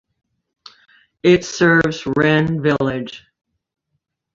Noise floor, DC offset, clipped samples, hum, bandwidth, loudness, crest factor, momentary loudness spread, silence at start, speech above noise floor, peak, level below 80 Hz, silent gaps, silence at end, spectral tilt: -74 dBFS; under 0.1%; under 0.1%; none; 7.8 kHz; -16 LUFS; 18 dB; 8 LU; 1.25 s; 58 dB; -2 dBFS; -50 dBFS; none; 1.15 s; -6 dB/octave